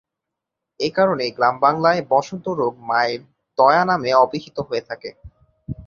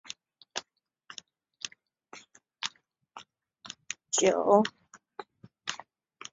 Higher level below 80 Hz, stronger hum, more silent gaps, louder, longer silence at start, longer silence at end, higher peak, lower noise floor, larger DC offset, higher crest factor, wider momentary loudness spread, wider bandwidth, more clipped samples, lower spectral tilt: first, -52 dBFS vs -78 dBFS; neither; neither; first, -19 LUFS vs -30 LUFS; first, 0.8 s vs 0.1 s; second, 0 s vs 0.55 s; first, -2 dBFS vs -8 dBFS; first, -83 dBFS vs -66 dBFS; neither; second, 18 dB vs 24 dB; second, 15 LU vs 26 LU; second, 7.2 kHz vs 8 kHz; neither; first, -5.5 dB/octave vs -2.5 dB/octave